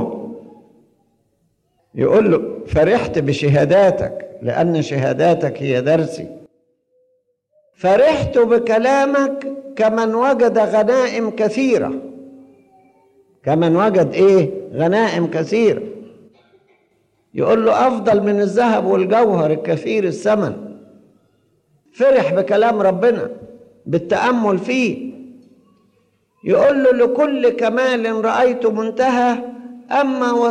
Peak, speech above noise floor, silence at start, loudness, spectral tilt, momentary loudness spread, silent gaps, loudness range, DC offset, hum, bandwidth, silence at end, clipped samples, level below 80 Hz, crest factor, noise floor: -4 dBFS; 49 dB; 0 s; -16 LUFS; -6.5 dB/octave; 13 LU; none; 4 LU; under 0.1%; none; 10.5 kHz; 0 s; under 0.1%; -48 dBFS; 12 dB; -64 dBFS